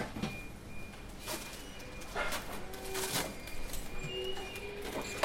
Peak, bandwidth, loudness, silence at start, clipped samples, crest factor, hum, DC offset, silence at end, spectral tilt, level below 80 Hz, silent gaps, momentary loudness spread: -14 dBFS; 16.5 kHz; -40 LUFS; 0 s; under 0.1%; 24 dB; none; under 0.1%; 0 s; -3 dB/octave; -48 dBFS; none; 11 LU